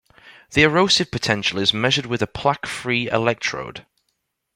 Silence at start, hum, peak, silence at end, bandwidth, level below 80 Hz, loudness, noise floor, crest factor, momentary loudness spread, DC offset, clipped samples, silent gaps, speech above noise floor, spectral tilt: 0.25 s; none; -2 dBFS; 0.75 s; 16.5 kHz; -50 dBFS; -19 LUFS; -74 dBFS; 20 dB; 9 LU; under 0.1%; under 0.1%; none; 53 dB; -4 dB/octave